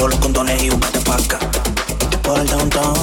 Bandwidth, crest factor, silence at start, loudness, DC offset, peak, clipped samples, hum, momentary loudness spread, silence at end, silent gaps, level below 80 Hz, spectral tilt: 18.5 kHz; 12 dB; 0 s; -17 LUFS; under 0.1%; -4 dBFS; under 0.1%; none; 3 LU; 0 s; none; -22 dBFS; -3.5 dB/octave